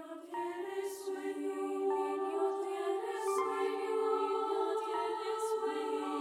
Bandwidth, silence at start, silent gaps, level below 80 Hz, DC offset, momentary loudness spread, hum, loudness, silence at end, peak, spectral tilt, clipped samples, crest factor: 15.5 kHz; 0 s; none; -88 dBFS; under 0.1%; 6 LU; none; -36 LUFS; 0 s; -22 dBFS; -2.5 dB/octave; under 0.1%; 14 dB